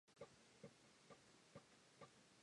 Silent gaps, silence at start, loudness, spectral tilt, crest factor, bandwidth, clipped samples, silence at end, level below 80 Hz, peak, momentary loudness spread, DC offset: none; 0.05 s; -66 LUFS; -4 dB/octave; 20 dB; 11 kHz; under 0.1%; 0 s; under -90 dBFS; -46 dBFS; 3 LU; under 0.1%